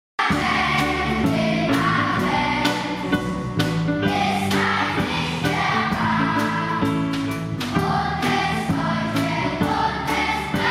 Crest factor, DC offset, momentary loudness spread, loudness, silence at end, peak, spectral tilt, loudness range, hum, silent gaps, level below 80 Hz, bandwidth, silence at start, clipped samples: 16 dB; under 0.1%; 4 LU; -21 LUFS; 0 s; -4 dBFS; -5.5 dB/octave; 2 LU; none; none; -42 dBFS; 16 kHz; 0.2 s; under 0.1%